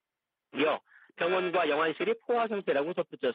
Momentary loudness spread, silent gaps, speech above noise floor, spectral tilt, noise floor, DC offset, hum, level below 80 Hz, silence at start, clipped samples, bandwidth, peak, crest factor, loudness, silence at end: 6 LU; none; 59 dB; -8 dB/octave; -89 dBFS; under 0.1%; none; -80 dBFS; 0.55 s; under 0.1%; 5 kHz; -14 dBFS; 16 dB; -30 LUFS; 0 s